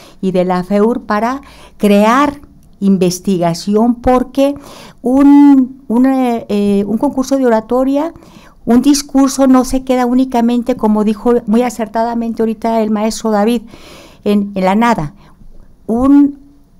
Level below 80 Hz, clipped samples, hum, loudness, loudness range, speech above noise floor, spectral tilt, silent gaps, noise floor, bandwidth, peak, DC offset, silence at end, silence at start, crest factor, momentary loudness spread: -36 dBFS; under 0.1%; none; -12 LUFS; 4 LU; 24 dB; -6 dB/octave; none; -36 dBFS; 16 kHz; -2 dBFS; under 0.1%; 0.45 s; 0.2 s; 10 dB; 8 LU